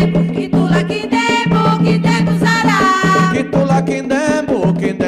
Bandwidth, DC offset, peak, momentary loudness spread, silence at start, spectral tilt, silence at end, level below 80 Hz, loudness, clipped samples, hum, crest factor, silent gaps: 11 kHz; under 0.1%; -4 dBFS; 4 LU; 0 s; -6 dB/octave; 0 s; -40 dBFS; -14 LUFS; under 0.1%; none; 10 dB; none